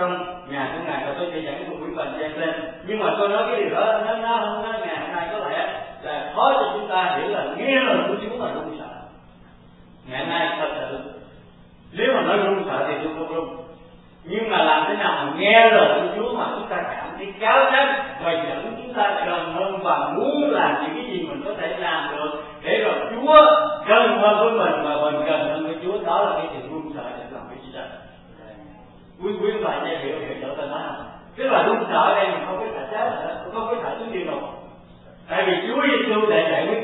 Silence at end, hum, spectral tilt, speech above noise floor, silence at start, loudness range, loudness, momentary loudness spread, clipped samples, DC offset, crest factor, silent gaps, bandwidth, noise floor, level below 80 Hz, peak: 0 s; none; -9 dB/octave; 27 dB; 0 s; 11 LU; -21 LUFS; 15 LU; under 0.1%; under 0.1%; 22 dB; none; 4.1 kHz; -48 dBFS; -56 dBFS; 0 dBFS